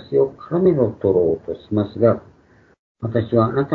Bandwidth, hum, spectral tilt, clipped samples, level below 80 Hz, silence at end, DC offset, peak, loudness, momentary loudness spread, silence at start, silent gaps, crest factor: 4.5 kHz; none; -11 dB/octave; under 0.1%; -52 dBFS; 0 s; under 0.1%; -2 dBFS; -19 LUFS; 7 LU; 0 s; 2.79-2.95 s; 18 dB